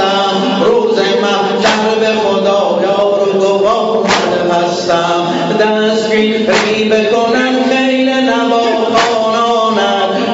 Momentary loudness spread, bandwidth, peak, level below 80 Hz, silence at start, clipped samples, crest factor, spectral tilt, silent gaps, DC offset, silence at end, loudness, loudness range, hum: 2 LU; 8 kHz; 0 dBFS; -52 dBFS; 0 s; under 0.1%; 12 dB; -4.5 dB/octave; none; under 0.1%; 0 s; -11 LUFS; 1 LU; none